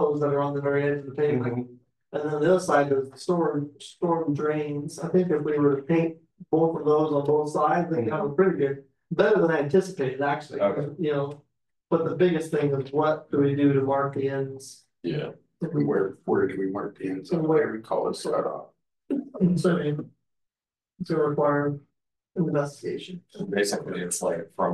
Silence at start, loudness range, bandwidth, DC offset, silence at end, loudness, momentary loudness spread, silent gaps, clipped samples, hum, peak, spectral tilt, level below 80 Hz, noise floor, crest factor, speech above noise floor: 0 s; 4 LU; 12.5 kHz; under 0.1%; 0 s; -26 LUFS; 11 LU; none; under 0.1%; none; -8 dBFS; -6.5 dB/octave; -66 dBFS; under -90 dBFS; 18 dB; over 65 dB